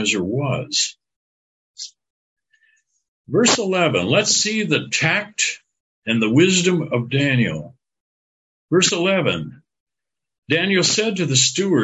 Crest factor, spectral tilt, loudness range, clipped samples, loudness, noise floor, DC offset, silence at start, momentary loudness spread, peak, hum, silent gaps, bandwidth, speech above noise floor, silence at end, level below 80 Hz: 18 dB; -3.5 dB/octave; 5 LU; under 0.1%; -18 LUFS; -87 dBFS; under 0.1%; 0 s; 11 LU; -2 dBFS; none; 1.16-1.74 s, 2.10-2.36 s, 3.08-3.24 s, 5.80-6.02 s, 8.00-8.68 s, 9.80-9.87 s, 10.38-10.42 s; 9 kHz; 69 dB; 0 s; -56 dBFS